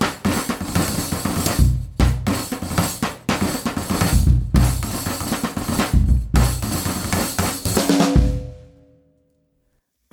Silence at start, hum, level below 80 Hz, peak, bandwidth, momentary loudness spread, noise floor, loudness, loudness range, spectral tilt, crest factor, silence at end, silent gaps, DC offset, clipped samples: 0 s; none; -24 dBFS; -2 dBFS; 19 kHz; 7 LU; -68 dBFS; -20 LUFS; 2 LU; -5 dB/octave; 18 dB; 1.5 s; none; under 0.1%; under 0.1%